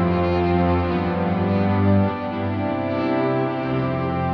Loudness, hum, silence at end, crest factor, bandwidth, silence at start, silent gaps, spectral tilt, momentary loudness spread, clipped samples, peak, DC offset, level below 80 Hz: -21 LUFS; none; 0 s; 14 dB; 5.6 kHz; 0 s; none; -10 dB/octave; 5 LU; under 0.1%; -6 dBFS; under 0.1%; -42 dBFS